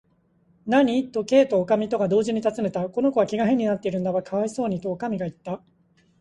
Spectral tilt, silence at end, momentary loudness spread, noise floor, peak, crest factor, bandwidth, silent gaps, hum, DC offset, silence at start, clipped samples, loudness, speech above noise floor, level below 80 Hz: -6.5 dB/octave; 0.65 s; 10 LU; -63 dBFS; -6 dBFS; 18 dB; 11 kHz; none; none; under 0.1%; 0.65 s; under 0.1%; -23 LUFS; 40 dB; -62 dBFS